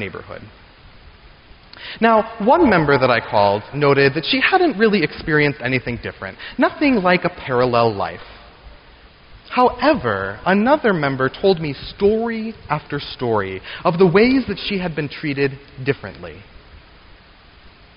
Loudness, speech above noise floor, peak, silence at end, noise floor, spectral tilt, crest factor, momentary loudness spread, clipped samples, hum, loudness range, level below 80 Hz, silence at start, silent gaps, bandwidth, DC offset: -18 LUFS; 29 dB; -2 dBFS; 1.2 s; -46 dBFS; -4 dB/octave; 16 dB; 13 LU; under 0.1%; none; 4 LU; -44 dBFS; 0 s; none; 5.6 kHz; under 0.1%